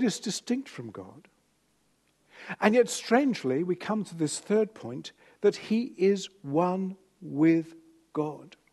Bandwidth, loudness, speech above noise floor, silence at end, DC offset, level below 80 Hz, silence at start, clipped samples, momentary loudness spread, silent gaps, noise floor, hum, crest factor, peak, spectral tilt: 12.5 kHz; -28 LUFS; 43 dB; 0.25 s; under 0.1%; -76 dBFS; 0 s; under 0.1%; 18 LU; none; -70 dBFS; 50 Hz at -65 dBFS; 22 dB; -6 dBFS; -5 dB/octave